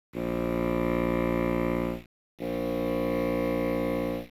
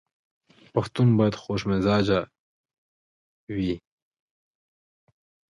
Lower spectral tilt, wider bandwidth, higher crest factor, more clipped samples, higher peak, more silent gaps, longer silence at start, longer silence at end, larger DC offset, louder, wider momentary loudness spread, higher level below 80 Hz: about the same, -8 dB/octave vs -7.5 dB/octave; first, 16.5 kHz vs 11 kHz; second, 12 dB vs 18 dB; neither; second, -16 dBFS vs -10 dBFS; second, 2.06-2.38 s vs 2.39-2.64 s, 2.78-3.47 s; second, 0.15 s vs 0.75 s; second, 0.1 s vs 1.7 s; first, 0.1% vs under 0.1%; second, -29 LUFS vs -25 LUFS; second, 6 LU vs 12 LU; first, -44 dBFS vs -52 dBFS